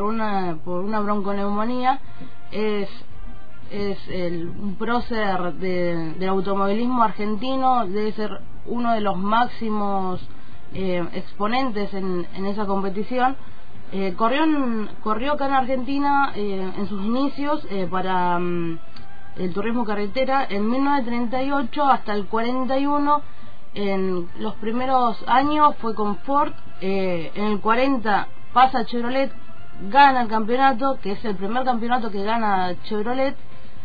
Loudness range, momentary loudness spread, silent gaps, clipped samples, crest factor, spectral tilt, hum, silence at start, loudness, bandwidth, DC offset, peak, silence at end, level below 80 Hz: 6 LU; 10 LU; none; under 0.1%; 18 dB; -8 dB/octave; none; 0 s; -23 LUFS; 5 kHz; 8%; -4 dBFS; 0 s; -46 dBFS